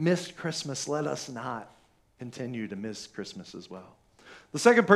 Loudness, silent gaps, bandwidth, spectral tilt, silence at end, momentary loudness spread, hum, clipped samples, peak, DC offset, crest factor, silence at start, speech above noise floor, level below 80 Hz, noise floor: -31 LUFS; none; 13.5 kHz; -4.5 dB/octave; 0 s; 21 LU; none; under 0.1%; -4 dBFS; under 0.1%; 26 dB; 0 s; 26 dB; -72 dBFS; -54 dBFS